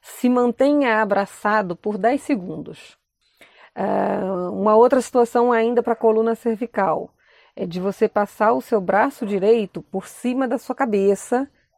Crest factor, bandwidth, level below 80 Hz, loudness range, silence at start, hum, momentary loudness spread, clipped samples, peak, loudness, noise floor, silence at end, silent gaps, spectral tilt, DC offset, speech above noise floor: 16 dB; 15 kHz; -64 dBFS; 4 LU; 0.05 s; none; 10 LU; under 0.1%; -4 dBFS; -20 LUFS; -55 dBFS; 0.35 s; none; -6 dB/octave; under 0.1%; 35 dB